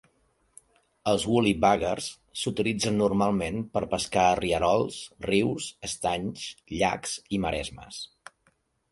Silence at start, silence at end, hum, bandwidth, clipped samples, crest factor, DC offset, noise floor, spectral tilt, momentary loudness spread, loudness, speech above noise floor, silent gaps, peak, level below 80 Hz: 1.05 s; 0.85 s; none; 11.5 kHz; under 0.1%; 20 dB; under 0.1%; -69 dBFS; -4.5 dB/octave; 12 LU; -27 LUFS; 43 dB; none; -6 dBFS; -50 dBFS